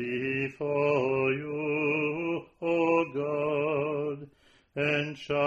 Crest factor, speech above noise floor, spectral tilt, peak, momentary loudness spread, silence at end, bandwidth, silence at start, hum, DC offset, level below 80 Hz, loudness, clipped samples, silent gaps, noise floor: 16 dB; 33 dB; -7 dB/octave; -14 dBFS; 7 LU; 0 s; 7.6 kHz; 0 s; none; under 0.1%; -66 dBFS; -29 LUFS; under 0.1%; none; -61 dBFS